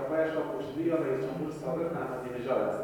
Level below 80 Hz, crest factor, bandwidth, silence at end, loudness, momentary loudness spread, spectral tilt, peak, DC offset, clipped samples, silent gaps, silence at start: -62 dBFS; 16 dB; 18.5 kHz; 0 s; -32 LUFS; 6 LU; -7.5 dB/octave; -16 dBFS; under 0.1%; under 0.1%; none; 0 s